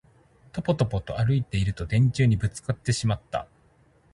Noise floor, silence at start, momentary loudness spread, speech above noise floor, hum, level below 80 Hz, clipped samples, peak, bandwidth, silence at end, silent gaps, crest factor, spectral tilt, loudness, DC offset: -60 dBFS; 0.55 s; 9 LU; 36 dB; none; -44 dBFS; under 0.1%; -8 dBFS; 11.5 kHz; 0.7 s; none; 18 dB; -6.5 dB/octave; -26 LUFS; under 0.1%